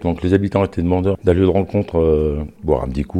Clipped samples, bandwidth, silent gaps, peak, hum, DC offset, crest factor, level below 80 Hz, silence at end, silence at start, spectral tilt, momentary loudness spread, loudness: under 0.1%; 9.8 kHz; none; 0 dBFS; none; under 0.1%; 16 dB; -30 dBFS; 0 s; 0 s; -9 dB/octave; 5 LU; -18 LUFS